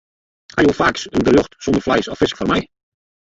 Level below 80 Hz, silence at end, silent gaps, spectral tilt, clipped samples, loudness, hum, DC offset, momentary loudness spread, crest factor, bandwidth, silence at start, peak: -42 dBFS; 0.7 s; none; -5.5 dB/octave; under 0.1%; -17 LUFS; none; under 0.1%; 6 LU; 18 dB; 7.8 kHz; 0.55 s; 0 dBFS